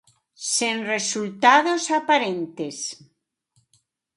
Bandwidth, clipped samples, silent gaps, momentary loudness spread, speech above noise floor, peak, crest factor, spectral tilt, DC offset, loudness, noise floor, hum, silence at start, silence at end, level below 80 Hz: 11.5 kHz; under 0.1%; none; 15 LU; 49 dB; -4 dBFS; 20 dB; -2 dB/octave; under 0.1%; -21 LUFS; -70 dBFS; none; 0.4 s; 1.2 s; -76 dBFS